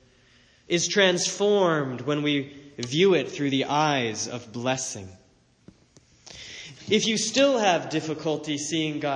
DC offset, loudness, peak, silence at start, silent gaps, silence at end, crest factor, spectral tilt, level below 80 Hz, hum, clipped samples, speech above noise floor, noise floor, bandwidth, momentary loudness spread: under 0.1%; -24 LUFS; -4 dBFS; 0.7 s; none; 0 s; 20 dB; -3.5 dB/octave; -66 dBFS; none; under 0.1%; 34 dB; -58 dBFS; 10.5 kHz; 18 LU